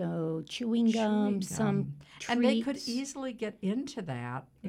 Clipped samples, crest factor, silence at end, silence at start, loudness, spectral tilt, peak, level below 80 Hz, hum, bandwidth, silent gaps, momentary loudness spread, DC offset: under 0.1%; 18 dB; 0 s; 0 s; -32 LUFS; -5.5 dB/octave; -14 dBFS; -66 dBFS; none; 15 kHz; none; 11 LU; under 0.1%